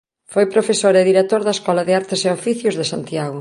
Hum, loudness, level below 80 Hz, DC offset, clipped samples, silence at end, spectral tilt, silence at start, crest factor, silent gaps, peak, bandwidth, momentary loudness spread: none; -17 LUFS; -64 dBFS; under 0.1%; under 0.1%; 0 s; -4.5 dB/octave; 0.3 s; 16 dB; none; -2 dBFS; 11.5 kHz; 9 LU